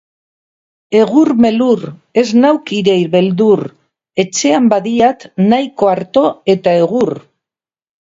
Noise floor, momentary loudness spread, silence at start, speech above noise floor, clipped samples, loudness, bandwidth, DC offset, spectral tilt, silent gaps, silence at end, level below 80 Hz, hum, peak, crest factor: -89 dBFS; 7 LU; 0.9 s; 77 dB; under 0.1%; -12 LUFS; 7.8 kHz; under 0.1%; -5.5 dB/octave; none; 0.9 s; -56 dBFS; none; 0 dBFS; 12 dB